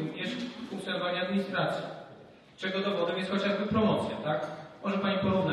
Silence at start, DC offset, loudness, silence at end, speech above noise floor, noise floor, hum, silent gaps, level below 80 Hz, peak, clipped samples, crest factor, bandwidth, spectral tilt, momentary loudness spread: 0 s; under 0.1%; -31 LUFS; 0 s; 23 dB; -53 dBFS; none; none; -60 dBFS; -16 dBFS; under 0.1%; 16 dB; 11.5 kHz; -6.5 dB/octave; 11 LU